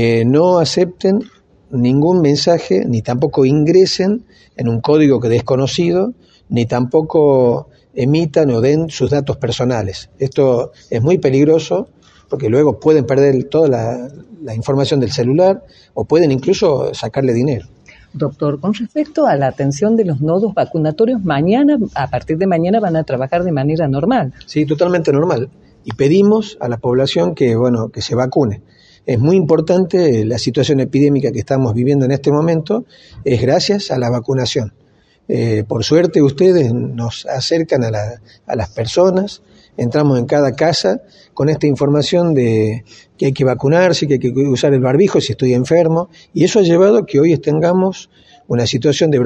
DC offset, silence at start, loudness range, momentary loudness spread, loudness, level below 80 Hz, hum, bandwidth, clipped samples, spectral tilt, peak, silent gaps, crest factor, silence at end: under 0.1%; 0 s; 3 LU; 10 LU; -14 LUFS; -46 dBFS; none; 8.8 kHz; under 0.1%; -6.5 dB/octave; 0 dBFS; none; 14 dB; 0 s